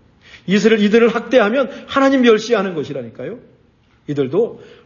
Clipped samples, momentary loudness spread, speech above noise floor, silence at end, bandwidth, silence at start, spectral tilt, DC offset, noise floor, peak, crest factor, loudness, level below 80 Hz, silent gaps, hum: under 0.1%; 17 LU; 39 dB; 0.2 s; 7.2 kHz; 0.35 s; -5.5 dB/octave; under 0.1%; -54 dBFS; 0 dBFS; 16 dB; -15 LUFS; -56 dBFS; none; none